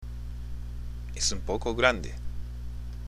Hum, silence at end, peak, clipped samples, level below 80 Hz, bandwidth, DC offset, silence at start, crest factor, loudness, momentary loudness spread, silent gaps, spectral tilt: 60 Hz at -35 dBFS; 0 s; -4 dBFS; under 0.1%; -38 dBFS; 14.5 kHz; under 0.1%; 0 s; 26 dB; -31 LUFS; 15 LU; none; -3.5 dB/octave